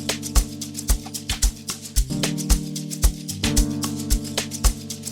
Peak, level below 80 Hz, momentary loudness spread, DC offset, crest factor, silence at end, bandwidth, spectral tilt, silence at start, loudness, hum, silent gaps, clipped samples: -4 dBFS; -26 dBFS; 6 LU; under 0.1%; 20 dB; 0 s; 19 kHz; -3.5 dB/octave; 0 s; -24 LUFS; none; none; under 0.1%